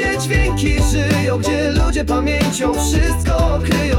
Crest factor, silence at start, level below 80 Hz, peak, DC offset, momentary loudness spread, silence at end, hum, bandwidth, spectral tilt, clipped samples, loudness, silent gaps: 10 dB; 0 s; -20 dBFS; -6 dBFS; under 0.1%; 1 LU; 0 s; none; 17 kHz; -5 dB/octave; under 0.1%; -17 LUFS; none